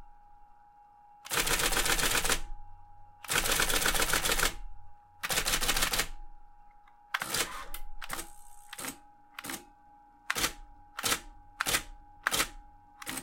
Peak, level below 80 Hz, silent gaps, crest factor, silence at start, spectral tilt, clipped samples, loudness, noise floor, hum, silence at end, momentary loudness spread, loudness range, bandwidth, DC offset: -8 dBFS; -42 dBFS; none; 24 dB; 0 s; -0.5 dB/octave; under 0.1%; -30 LUFS; -58 dBFS; none; 0 s; 18 LU; 10 LU; 17 kHz; under 0.1%